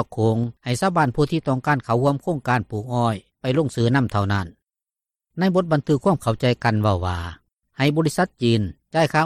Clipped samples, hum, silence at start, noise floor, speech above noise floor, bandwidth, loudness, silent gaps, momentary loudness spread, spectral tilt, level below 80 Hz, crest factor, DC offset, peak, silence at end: under 0.1%; none; 0 s; -90 dBFS; 69 dB; 14.5 kHz; -21 LUFS; none; 6 LU; -6.5 dB/octave; -50 dBFS; 16 dB; under 0.1%; -6 dBFS; 0 s